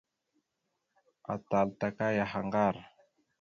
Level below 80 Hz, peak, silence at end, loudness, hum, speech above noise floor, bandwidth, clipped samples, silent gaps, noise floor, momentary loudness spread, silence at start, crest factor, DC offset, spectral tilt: -66 dBFS; -14 dBFS; 0.55 s; -32 LUFS; none; 52 dB; 7 kHz; under 0.1%; none; -83 dBFS; 11 LU; 1.3 s; 20 dB; under 0.1%; -7.5 dB/octave